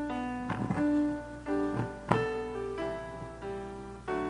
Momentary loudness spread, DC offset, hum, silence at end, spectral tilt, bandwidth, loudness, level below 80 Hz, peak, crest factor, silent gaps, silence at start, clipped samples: 11 LU; under 0.1%; none; 0 s; -7.5 dB/octave; 10 kHz; -34 LUFS; -52 dBFS; -4 dBFS; 28 dB; none; 0 s; under 0.1%